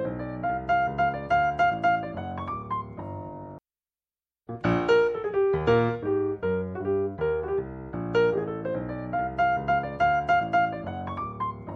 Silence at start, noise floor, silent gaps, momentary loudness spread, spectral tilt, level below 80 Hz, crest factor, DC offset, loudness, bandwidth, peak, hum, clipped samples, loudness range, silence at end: 0 s; under -90 dBFS; none; 11 LU; -7.5 dB/octave; -50 dBFS; 16 dB; under 0.1%; -26 LUFS; 7.4 kHz; -10 dBFS; none; under 0.1%; 4 LU; 0 s